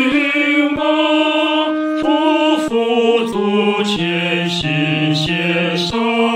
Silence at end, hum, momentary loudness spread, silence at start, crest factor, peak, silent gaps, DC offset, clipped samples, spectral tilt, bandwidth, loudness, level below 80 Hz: 0 s; none; 3 LU; 0 s; 12 dB; -2 dBFS; none; under 0.1%; under 0.1%; -5.5 dB/octave; 11 kHz; -15 LUFS; -50 dBFS